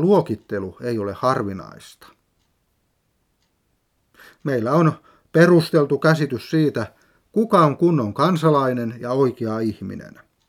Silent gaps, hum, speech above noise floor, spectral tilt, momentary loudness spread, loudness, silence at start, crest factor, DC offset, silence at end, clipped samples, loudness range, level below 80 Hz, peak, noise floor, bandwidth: none; none; 49 dB; -7.5 dB/octave; 15 LU; -20 LUFS; 0 s; 20 dB; under 0.1%; 0.4 s; under 0.1%; 11 LU; -62 dBFS; 0 dBFS; -68 dBFS; 15 kHz